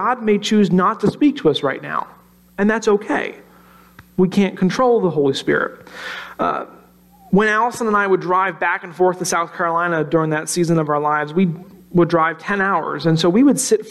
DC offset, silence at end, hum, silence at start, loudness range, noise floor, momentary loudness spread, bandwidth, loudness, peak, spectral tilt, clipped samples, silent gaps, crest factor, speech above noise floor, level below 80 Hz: under 0.1%; 0 s; none; 0 s; 2 LU; -48 dBFS; 10 LU; 14 kHz; -18 LUFS; -4 dBFS; -5.5 dB/octave; under 0.1%; none; 14 dB; 31 dB; -54 dBFS